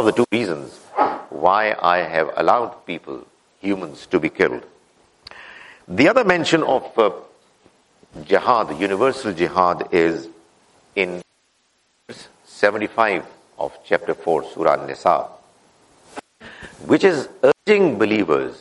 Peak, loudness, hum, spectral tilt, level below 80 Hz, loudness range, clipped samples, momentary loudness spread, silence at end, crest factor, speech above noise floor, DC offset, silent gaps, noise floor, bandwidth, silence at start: 0 dBFS; -19 LUFS; none; -5.5 dB/octave; -60 dBFS; 5 LU; under 0.1%; 22 LU; 0.05 s; 20 dB; 45 dB; under 0.1%; none; -64 dBFS; 11.5 kHz; 0 s